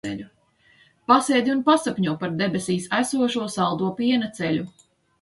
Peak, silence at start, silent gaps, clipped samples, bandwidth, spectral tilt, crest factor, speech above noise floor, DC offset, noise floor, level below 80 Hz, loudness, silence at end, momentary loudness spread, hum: -4 dBFS; 0.05 s; none; under 0.1%; 11.5 kHz; -5 dB/octave; 20 dB; 36 dB; under 0.1%; -58 dBFS; -62 dBFS; -22 LUFS; 0.5 s; 9 LU; none